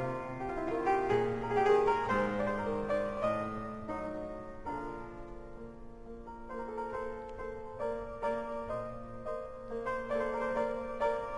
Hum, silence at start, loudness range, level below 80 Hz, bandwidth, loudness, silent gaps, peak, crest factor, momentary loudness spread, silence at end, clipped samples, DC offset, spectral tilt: none; 0 s; 11 LU; -52 dBFS; 10.5 kHz; -35 LUFS; none; -16 dBFS; 18 dB; 17 LU; 0 s; under 0.1%; under 0.1%; -7 dB/octave